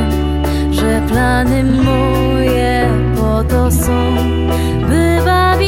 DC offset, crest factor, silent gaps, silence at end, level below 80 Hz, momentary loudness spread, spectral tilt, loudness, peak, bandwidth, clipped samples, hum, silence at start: under 0.1%; 12 dB; none; 0 s; -18 dBFS; 3 LU; -6.5 dB/octave; -13 LUFS; 0 dBFS; 16.5 kHz; under 0.1%; none; 0 s